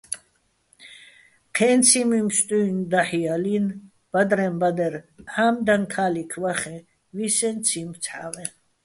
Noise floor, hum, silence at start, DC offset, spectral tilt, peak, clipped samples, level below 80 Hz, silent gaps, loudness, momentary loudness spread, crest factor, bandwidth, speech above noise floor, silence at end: -66 dBFS; none; 0.1 s; under 0.1%; -3.5 dB/octave; -4 dBFS; under 0.1%; -64 dBFS; none; -22 LUFS; 16 LU; 20 dB; 12 kHz; 44 dB; 0.35 s